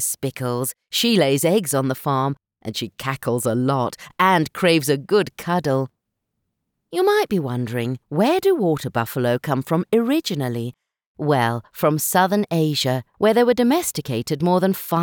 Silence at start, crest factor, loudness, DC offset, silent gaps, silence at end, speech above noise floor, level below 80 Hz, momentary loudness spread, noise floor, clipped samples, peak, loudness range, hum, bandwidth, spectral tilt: 0 s; 18 dB; -20 LUFS; under 0.1%; 11.06-11.15 s; 0 s; 57 dB; -62 dBFS; 9 LU; -77 dBFS; under 0.1%; -4 dBFS; 3 LU; none; over 20 kHz; -5 dB/octave